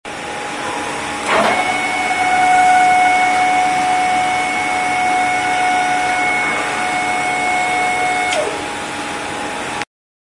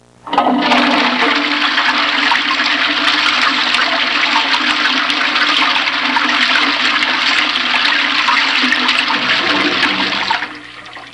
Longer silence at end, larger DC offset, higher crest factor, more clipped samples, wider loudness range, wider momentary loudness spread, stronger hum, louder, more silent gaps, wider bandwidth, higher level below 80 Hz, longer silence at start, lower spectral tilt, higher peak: first, 0.35 s vs 0 s; second, under 0.1% vs 0.1%; about the same, 16 dB vs 14 dB; neither; first, 4 LU vs 1 LU; first, 11 LU vs 3 LU; neither; second, -16 LUFS vs -12 LUFS; neither; about the same, 11.5 kHz vs 11.5 kHz; first, -50 dBFS vs -56 dBFS; second, 0.05 s vs 0.25 s; about the same, -2 dB/octave vs -1.5 dB/octave; about the same, 0 dBFS vs 0 dBFS